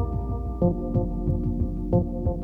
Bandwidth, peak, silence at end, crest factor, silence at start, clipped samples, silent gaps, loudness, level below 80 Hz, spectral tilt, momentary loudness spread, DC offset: 1.5 kHz; -10 dBFS; 0 s; 16 dB; 0 s; under 0.1%; none; -27 LUFS; -30 dBFS; -13 dB/octave; 4 LU; under 0.1%